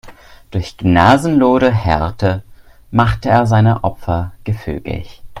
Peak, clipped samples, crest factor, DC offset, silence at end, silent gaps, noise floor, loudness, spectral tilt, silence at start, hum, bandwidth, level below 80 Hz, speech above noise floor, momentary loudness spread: 0 dBFS; under 0.1%; 14 dB; under 0.1%; 0 s; none; -38 dBFS; -15 LUFS; -7.5 dB/octave; 0.05 s; none; 12 kHz; -34 dBFS; 24 dB; 14 LU